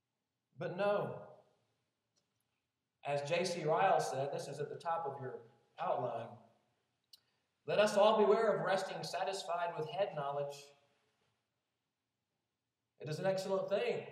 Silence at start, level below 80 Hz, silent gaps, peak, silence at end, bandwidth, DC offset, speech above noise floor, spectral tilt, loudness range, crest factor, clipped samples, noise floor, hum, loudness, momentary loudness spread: 0.6 s; under -90 dBFS; none; -18 dBFS; 0 s; 14 kHz; under 0.1%; 54 dB; -4.5 dB/octave; 10 LU; 20 dB; under 0.1%; -90 dBFS; none; -36 LUFS; 16 LU